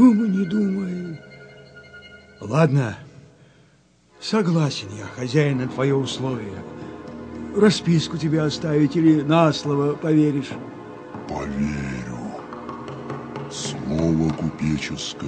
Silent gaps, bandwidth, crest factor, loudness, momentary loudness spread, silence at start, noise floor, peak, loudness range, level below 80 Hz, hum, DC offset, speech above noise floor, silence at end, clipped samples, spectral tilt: none; 9.4 kHz; 20 dB; -22 LUFS; 18 LU; 0 s; -57 dBFS; -2 dBFS; 7 LU; -48 dBFS; none; under 0.1%; 37 dB; 0 s; under 0.1%; -6.5 dB/octave